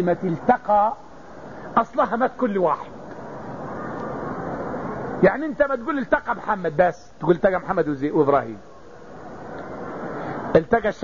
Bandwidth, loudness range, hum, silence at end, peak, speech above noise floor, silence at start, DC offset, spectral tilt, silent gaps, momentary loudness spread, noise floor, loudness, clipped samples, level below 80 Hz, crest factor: 7.4 kHz; 4 LU; none; 0 s; -4 dBFS; 22 dB; 0 s; 0.6%; -8 dB/octave; none; 18 LU; -43 dBFS; -22 LUFS; under 0.1%; -50 dBFS; 20 dB